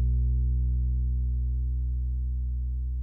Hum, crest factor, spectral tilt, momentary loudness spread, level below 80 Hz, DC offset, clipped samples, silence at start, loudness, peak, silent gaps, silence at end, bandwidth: none; 8 dB; -13 dB/octave; 5 LU; -26 dBFS; under 0.1%; under 0.1%; 0 s; -30 LUFS; -18 dBFS; none; 0 s; 0.5 kHz